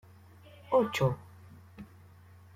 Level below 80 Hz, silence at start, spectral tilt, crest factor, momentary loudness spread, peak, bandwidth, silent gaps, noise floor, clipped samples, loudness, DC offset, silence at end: -64 dBFS; 0.7 s; -6.5 dB/octave; 20 dB; 25 LU; -14 dBFS; 16 kHz; none; -55 dBFS; under 0.1%; -30 LUFS; under 0.1%; 0.7 s